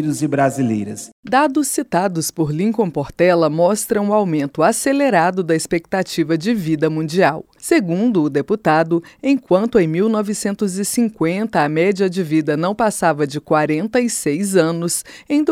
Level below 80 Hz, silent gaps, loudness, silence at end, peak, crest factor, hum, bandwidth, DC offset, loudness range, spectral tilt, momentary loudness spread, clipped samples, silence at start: -54 dBFS; 1.12-1.23 s; -17 LUFS; 0 s; 0 dBFS; 16 dB; none; 16.5 kHz; under 0.1%; 2 LU; -5.5 dB/octave; 5 LU; under 0.1%; 0 s